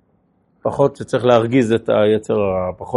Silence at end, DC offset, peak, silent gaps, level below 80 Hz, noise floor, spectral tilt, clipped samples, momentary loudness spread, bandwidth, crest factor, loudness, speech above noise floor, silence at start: 0 s; under 0.1%; 0 dBFS; none; -52 dBFS; -60 dBFS; -7 dB/octave; under 0.1%; 8 LU; 11.5 kHz; 18 dB; -17 LUFS; 44 dB; 0.65 s